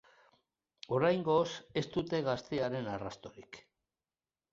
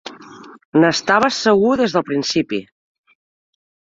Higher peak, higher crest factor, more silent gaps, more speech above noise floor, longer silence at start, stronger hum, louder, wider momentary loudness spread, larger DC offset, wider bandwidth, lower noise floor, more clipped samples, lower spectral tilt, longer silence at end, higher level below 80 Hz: second, -16 dBFS vs -2 dBFS; about the same, 20 dB vs 18 dB; second, none vs 0.65-0.72 s; first, over 56 dB vs 24 dB; first, 0.9 s vs 0.05 s; neither; second, -34 LUFS vs -16 LUFS; first, 22 LU vs 9 LU; neither; about the same, 7.6 kHz vs 7.8 kHz; first, under -90 dBFS vs -40 dBFS; neither; first, -6 dB/octave vs -4.5 dB/octave; second, 0.95 s vs 1.25 s; second, -68 dBFS vs -58 dBFS